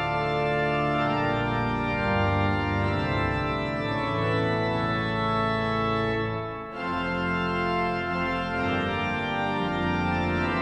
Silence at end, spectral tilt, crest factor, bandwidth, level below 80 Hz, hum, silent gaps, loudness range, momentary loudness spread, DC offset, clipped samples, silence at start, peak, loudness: 0 s; -7.5 dB/octave; 12 dB; 10 kHz; -44 dBFS; none; none; 2 LU; 3 LU; under 0.1%; under 0.1%; 0 s; -14 dBFS; -26 LUFS